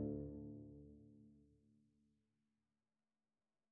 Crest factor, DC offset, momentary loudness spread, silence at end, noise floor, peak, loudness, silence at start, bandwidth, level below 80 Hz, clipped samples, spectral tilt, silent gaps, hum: 20 dB; under 0.1%; 19 LU; 1.95 s; under -90 dBFS; -34 dBFS; -53 LUFS; 0 s; 1.8 kHz; -70 dBFS; under 0.1%; -10 dB/octave; none; none